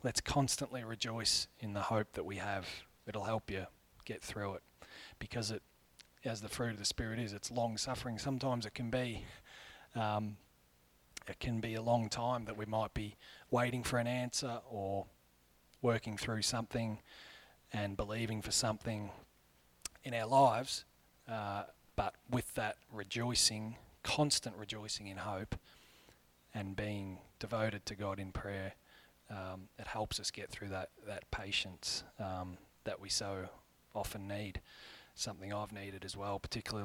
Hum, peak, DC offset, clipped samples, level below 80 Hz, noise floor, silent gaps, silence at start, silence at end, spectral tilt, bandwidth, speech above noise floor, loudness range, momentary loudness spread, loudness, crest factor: none; -16 dBFS; under 0.1%; under 0.1%; -60 dBFS; -70 dBFS; none; 0 s; 0 s; -4 dB/octave; 19 kHz; 31 dB; 7 LU; 15 LU; -39 LUFS; 24 dB